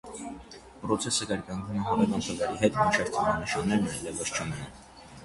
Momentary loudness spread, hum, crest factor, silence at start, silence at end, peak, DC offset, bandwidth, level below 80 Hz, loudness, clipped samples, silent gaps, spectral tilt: 17 LU; none; 22 dB; 0.05 s; 0 s; -8 dBFS; under 0.1%; 11.5 kHz; -52 dBFS; -28 LUFS; under 0.1%; none; -4 dB/octave